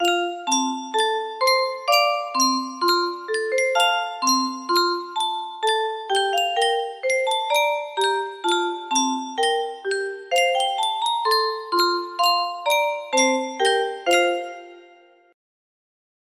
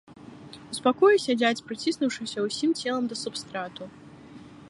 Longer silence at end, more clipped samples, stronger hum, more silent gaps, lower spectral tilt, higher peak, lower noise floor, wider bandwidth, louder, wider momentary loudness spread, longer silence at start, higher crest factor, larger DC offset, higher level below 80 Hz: first, 1.5 s vs 0 s; neither; neither; neither; second, 0.5 dB/octave vs -3.5 dB/octave; first, -4 dBFS vs -8 dBFS; first, -52 dBFS vs -47 dBFS; first, 15.5 kHz vs 11.5 kHz; first, -21 LUFS vs -26 LUFS; second, 5 LU vs 24 LU; about the same, 0 s vs 0.1 s; about the same, 18 dB vs 20 dB; neither; second, -74 dBFS vs -68 dBFS